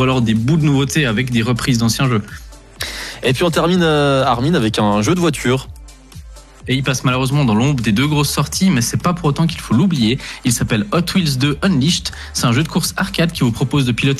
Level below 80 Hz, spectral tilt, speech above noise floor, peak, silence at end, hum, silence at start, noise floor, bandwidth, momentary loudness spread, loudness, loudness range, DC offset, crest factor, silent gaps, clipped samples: -38 dBFS; -5 dB/octave; 21 dB; -4 dBFS; 0 s; none; 0 s; -36 dBFS; 14 kHz; 6 LU; -16 LUFS; 2 LU; under 0.1%; 12 dB; none; under 0.1%